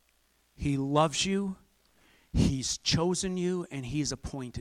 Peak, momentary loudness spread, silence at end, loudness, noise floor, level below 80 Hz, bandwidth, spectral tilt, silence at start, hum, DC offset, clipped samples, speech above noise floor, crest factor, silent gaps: -10 dBFS; 10 LU; 0 s; -30 LUFS; -69 dBFS; -46 dBFS; 14 kHz; -4.5 dB/octave; 0.6 s; none; under 0.1%; under 0.1%; 40 dB; 20 dB; none